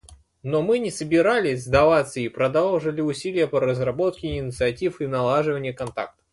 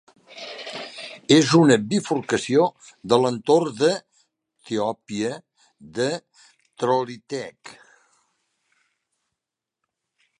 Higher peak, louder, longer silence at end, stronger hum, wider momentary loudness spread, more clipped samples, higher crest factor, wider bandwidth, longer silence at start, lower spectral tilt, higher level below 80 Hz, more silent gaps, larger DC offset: about the same, -4 dBFS vs -2 dBFS; about the same, -23 LUFS vs -22 LUFS; second, 0.25 s vs 2.7 s; neither; second, 10 LU vs 19 LU; neither; about the same, 18 dB vs 22 dB; about the same, 11.5 kHz vs 10.5 kHz; second, 0.1 s vs 0.3 s; about the same, -6 dB/octave vs -5 dB/octave; first, -46 dBFS vs -66 dBFS; neither; neither